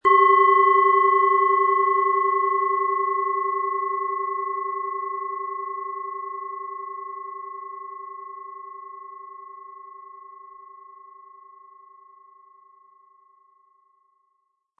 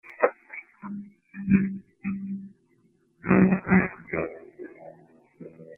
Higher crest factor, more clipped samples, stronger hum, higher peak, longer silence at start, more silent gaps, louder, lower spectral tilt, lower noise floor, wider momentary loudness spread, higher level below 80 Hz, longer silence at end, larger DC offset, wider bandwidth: about the same, 18 dB vs 22 dB; neither; neither; about the same, -6 dBFS vs -4 dBFS; about the same, 0.05 s vs 0.1 s; neither; first, -21 LUFS vs -25 LUFS; second, -5 dB/octave vs -12.5 dB/octave; first, -73 dBFS vs -65 dBFS; about the same, 25 LU vs 24 LU; second, -80 dBFS vs -54 dBFS; first, 3.85 s vs 0.05 s; neither; first, 3.3 kHz vs 2.8 kHz